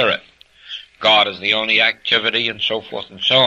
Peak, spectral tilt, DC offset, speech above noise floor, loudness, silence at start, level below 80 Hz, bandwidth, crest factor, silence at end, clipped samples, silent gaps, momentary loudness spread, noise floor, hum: -2 dBFS; -3.5 dB/octave; under 0.1%; 30 dB; -16 LUFS; 0 s; -60 dBFS; 8.4 kHz; 16 dB; 0 s; under 0.1%; none; 17 LU; -47 dBFS; none